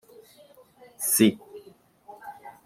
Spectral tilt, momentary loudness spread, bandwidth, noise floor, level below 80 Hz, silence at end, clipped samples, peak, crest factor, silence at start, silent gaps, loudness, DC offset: -3.5 dB/octave; 26 LU; 16 kHz; -55 dBFS; -72 dBFS; 0.15 s; under 0.1%; -8 dBFS; 22 dB; 1 s; none; -22 LUFS; under 0.1%